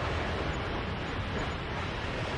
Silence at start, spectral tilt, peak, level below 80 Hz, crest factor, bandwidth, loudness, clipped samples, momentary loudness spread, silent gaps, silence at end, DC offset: 0 s; -5.5 dB/octave; -20 dBFS; -42 dBFS; 12 dB; 11 kHz; -34 LUFS; under 0.1%; 2 LU; none; 0 s; under 0.1%